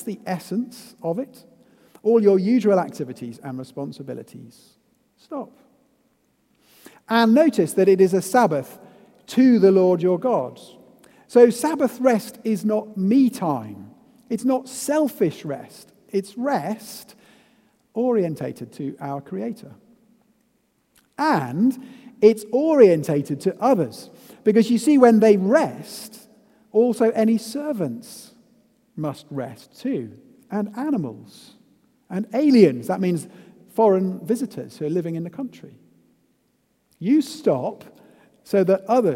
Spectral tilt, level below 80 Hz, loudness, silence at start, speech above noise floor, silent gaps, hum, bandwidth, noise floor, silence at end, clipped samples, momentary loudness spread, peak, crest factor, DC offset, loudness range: -6.5 dB/octave; -72 dBFS; -20 LUFS; 0 s; 47 dB; none; none; 16.5 kHz; -67 dBFS; 0 s; under 0.1%; 19 LU; 0 dBFS; 22 dB; under 0.1%; 11 LU